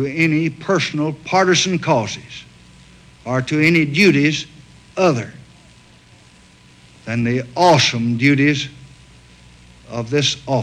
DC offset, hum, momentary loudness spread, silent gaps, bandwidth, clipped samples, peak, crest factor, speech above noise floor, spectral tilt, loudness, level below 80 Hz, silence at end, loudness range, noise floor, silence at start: under 0.1%; none; 18 LU; none; 13 kHz; under 0.1%; -4 dBFS; 16 dB; 31 dB; -5 dB/octave; -17 LUFS; -52 dBFS; 0 s; 3 LU; -47 dBFS; 0 s